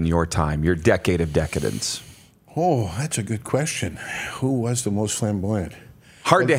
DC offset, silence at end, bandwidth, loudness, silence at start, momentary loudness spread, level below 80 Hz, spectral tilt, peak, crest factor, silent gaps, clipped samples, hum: under 0.1%; 0 s; 16 kHz; -23 LUFS; 0 s; 9 LU; -42 dBFS; -5 dB/octave; 0 dBFS; 22 dB; none; under 0.1%; none